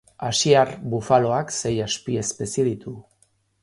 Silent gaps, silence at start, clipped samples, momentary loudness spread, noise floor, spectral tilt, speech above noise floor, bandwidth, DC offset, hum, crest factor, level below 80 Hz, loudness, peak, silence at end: none; 0.2 s; under 0.1%; 11 LU; -64 dBFS; -4 dB/octave; 42 dB; 11.5 kHz; under 0.1%; none; 20 dB; -54 dBFS; -22 LUFS; -2 dBFS; 0.6 s